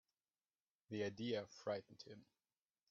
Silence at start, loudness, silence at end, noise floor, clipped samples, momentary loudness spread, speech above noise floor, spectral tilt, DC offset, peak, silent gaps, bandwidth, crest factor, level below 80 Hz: 0.9 s; -47 LUFS; 0.7 s; under -90 dBFS; under 0.1%; 15 LU; over 43 dB; -4.5 dB/octave; under 0.1%; -30 dBFS; none; 7.4 kHz; 18 dB; -88 dBFS